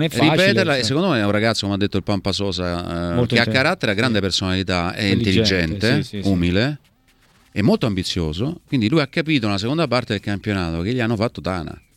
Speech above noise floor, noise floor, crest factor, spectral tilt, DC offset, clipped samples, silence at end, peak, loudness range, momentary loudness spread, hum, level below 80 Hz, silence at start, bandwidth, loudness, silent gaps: 37 dB; -56 dBFS; 20 dB; -5.5 dB/octave; under 0.1%; under 0.1%; 0.2 s; 0 dBFS; 3 LU; 7 LU; none; -44 dBFS; 0 s; 15.5 kHz; -19 LUFS; none